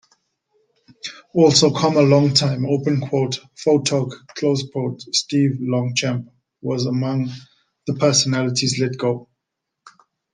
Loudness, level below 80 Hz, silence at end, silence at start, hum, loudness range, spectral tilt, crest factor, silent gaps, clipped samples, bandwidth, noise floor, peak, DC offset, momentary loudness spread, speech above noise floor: -19 LUFS; -60 dBFS; 1.1 s; 1.05 s; none; 5 LU; -5 dB/octave; 20 dB; none; under 0.1%; 10 kHz; -80 dBFS; 0 dBFS; under 0.1%; 14 LU; 62 dB